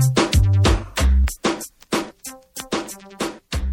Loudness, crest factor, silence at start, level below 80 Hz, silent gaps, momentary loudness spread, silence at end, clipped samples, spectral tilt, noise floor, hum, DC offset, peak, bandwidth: -21 LUFS; 12 dB; 0 s; -24 dBFS; none; 17 LU; 0 s; under 0.1%; -5 dB/octave; -39 dBFS; none; under 0.1%; -8 dBFS; 17 kHz